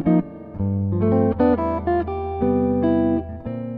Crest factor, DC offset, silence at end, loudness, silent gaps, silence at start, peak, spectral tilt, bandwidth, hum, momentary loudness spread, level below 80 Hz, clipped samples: 14 dB; under 0.1%; 0 s; -21 LUFS; none; 0 s; -6 dBFS; -12 dB/octave; 4.6 kHz; none; 9 LU; -38 dBFS; under 0.1%